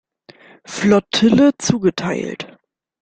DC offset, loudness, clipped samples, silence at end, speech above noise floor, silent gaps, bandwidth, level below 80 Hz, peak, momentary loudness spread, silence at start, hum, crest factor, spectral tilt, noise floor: under 0.1%; -16 LUFS; under 0.1%; 0.55 s; 38 dB; none; 9.2 kHz; -52 dBFS; -2 dBFS; 18 LU; 0.7 s; none; 16 dB; -5 dB/octave; -54 dBFS